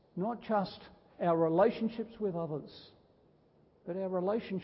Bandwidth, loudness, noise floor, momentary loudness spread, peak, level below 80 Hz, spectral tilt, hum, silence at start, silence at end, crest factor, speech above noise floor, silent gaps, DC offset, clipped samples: 5.6 kHz; -34 LUFS; -66 dBFS; 19 LU; -14 dBFS; -70 dBFS; -6.5 dB/octave; none; 0.15 s; 0 s; 20 dB; 33 dB; none; under 0.1%; under 0.1%